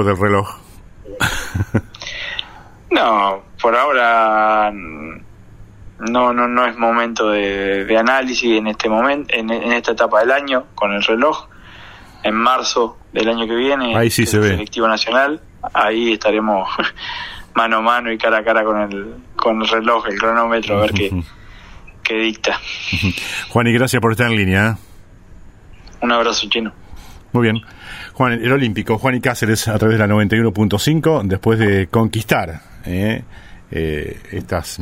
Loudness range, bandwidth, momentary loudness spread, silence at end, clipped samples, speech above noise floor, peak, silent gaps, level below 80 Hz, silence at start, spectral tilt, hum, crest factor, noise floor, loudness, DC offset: 3 LU; 16 kHz; 11 LU; 0 s; under 0.1%; 23 dB; 0 dBFS; none; -42 dBFS; 0 s; -5 dB/octave; none; 16 dB; -40 dBFS; -16 LUFS; under 0.1%